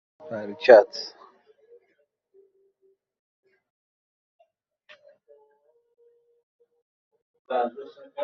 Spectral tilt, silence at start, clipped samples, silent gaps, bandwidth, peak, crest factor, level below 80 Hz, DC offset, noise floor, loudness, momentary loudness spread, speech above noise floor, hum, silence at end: -1.5 dB/octave; 0.3 s; under 0.1%; 3.19-3.43 s, 3.70-4.39 s, 6.43-6.59 s, 6.82-7.11 s, 7.22-7.45 s; 6.8 kHz; 0 dBFS; 26 dB; -78 dBFS; under 0.1%; -71 dBFS; -21 LUFS; 25 LU; 50 dB; none; 0 s